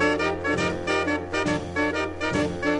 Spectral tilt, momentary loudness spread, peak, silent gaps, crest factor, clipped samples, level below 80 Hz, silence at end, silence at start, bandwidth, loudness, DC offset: -5 dB/octave; 2 LU; -10 dBFS; none; 14 dB; under 0.1%; -48 dBFS; 0 s; 0 s; 11 kHz; -25 LUFS; under 0.1%